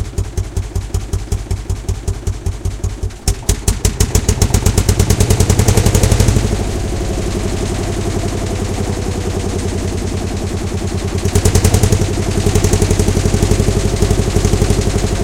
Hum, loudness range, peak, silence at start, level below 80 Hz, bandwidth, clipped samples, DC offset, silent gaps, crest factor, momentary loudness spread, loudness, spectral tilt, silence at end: none; 6 LU; 0 dBFS; 0 s; -20 dBFS; 17.5 kHz; 0.1%; under 0.1%; none; 14 dB; 9 LU; -16 LUFS; -5 dB/octave; 0 s